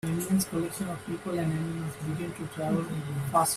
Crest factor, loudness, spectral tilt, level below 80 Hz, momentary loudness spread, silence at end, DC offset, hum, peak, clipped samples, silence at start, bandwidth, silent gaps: 20 dB; -31 LUFS; -5.5 dB/octave; -58 dBFS; 7 LU; 0 s; under 0.1%; none; -10 dBFS; under 0.1%; 0.05 s; 16 kHz; none